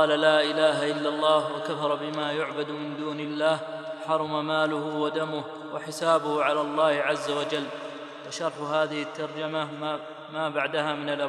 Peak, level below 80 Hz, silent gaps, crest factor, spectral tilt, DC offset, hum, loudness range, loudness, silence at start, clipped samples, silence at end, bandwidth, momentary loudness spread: -6 dBFS; -84 dBFS; none; 20 dB; -4.5 dB/octave; under 0.1%; none; 4 LU; -27 LUFS; 0 s; under 0.1%; 0 s; 12.5 kHz; 12 LU